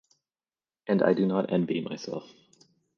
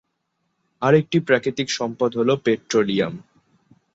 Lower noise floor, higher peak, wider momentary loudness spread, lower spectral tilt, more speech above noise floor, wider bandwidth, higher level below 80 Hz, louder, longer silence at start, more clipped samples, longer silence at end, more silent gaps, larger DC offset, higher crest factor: first, under -90 dBFS vs -73 dBFS; second, -10 dBFS vs -4 dBFS; first, 15 LU vs 6 LU; first, -7.5 dB/octave vs -5.5 dB/octave; first, over 63 dB vs 54 dB; second, 7 kHz vs 7.8 kHz; second, -72 dBFS vs -62 dBFS; second, -27 LUFS vs -21 LUFS; about the same, 0.85 s vs 0.8 s; neither; about the same, 0.75 s vs 0.75 s; neither; neither; about the same, 20 dB vs 18 dB